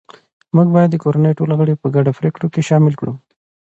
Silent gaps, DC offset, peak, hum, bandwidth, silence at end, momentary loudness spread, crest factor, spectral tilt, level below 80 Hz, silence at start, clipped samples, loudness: none; under 0.1%; 0 dBFS; none; 8 kHz; 0.6 s; 8 LU; 14 dB; -9 dB/octave; -58 dBFS; 0.55 s; under 0.1%; -15 LUFS